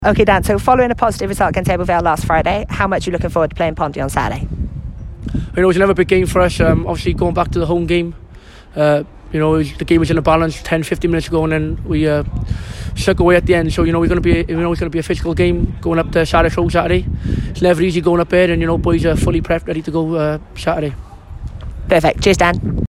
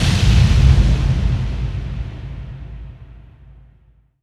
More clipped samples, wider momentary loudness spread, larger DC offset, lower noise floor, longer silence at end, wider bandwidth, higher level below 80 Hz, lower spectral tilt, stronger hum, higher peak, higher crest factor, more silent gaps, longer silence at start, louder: neither; second, 11 LU vs 21 LU; neither; second, -37 dBFS vs -53 dBFS; second, 0 s vs 1.1 s; first, 13.5 kHz vs 11.5 kHz; second, -26 dBFS vs -20 dBFS; about the same, -6.5 dB/octave vs -6 dB/octave; neither; about the same, 0 dBFS vs 0 dBFS; about the same, 14 dB vs 16 dB; neither; about the same, 0 s vs 0 s; about the same, -15 LUFS vs -17 LUFS